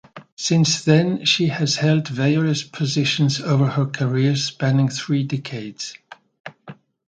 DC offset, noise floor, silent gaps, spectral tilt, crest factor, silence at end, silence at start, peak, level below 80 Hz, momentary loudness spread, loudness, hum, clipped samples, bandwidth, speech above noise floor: under 0.1%; -43 dBFS; 0.32-0.37 s, 6.40-6.44 s; -5 dB/octave; 20 dB; 0.35 s; 0.15 s; -2 dBFS; -62 dBFS; 14 LU; -19 LUFS; none; under 0.1%; 9.2 kHz; 24 dB